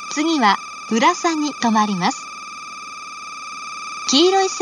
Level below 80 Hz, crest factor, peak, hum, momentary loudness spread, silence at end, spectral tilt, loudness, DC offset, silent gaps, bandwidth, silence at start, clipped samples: -72 dBFS; 18 dB; -2 dBFS; none; 16 LU; 0 s; -3 dB/octave; -18 LUFS; under 0.1%; none; 10 kHz; 0 s; under 0.1%